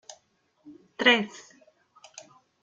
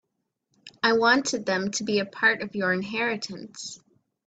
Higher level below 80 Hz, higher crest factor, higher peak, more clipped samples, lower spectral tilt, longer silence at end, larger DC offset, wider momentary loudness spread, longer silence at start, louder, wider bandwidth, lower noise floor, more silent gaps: second, -78 dBFS vs -70 dBFS; first, 26 dB vs 20 dB; about the same, -6 dBFS vs -8 dBFS; neither; about the same, -3 dB/octave vs -3 dB/octave; first, 1.25 s vs 0.5 s; neither; first, 27 LU vs 16 LU; about the same, 0.65 s vs 0.65 s; about the same, -23 LUFS vs -24 LUFS; about the same, 9.2 kHz vs 9.2 kHz; second, -68 dBFS vs -78 dBFS; neither